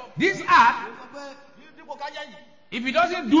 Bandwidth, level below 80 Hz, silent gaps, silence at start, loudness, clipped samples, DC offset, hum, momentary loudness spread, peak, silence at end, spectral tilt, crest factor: 7.6 kHz; -62 dBFS; none; 0 s; -20 LUFS; under 0.1%; 0.2%; none; 24 LU; -6 dBFS; 0 s; -4.5 dB/octave; 18 dB